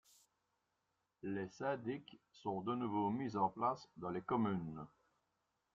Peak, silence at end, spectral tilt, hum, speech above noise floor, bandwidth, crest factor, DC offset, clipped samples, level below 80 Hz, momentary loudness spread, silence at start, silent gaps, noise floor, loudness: -24 dBFS; 0.85 s; -7.5 dB/octave; none; 45 dB; 8.4 kHz; 18 dB; under 0.1%; under 0.1%; -78 dBFS; 12 LU; 1.25 s; none; -86 dBFS; -41 LUFS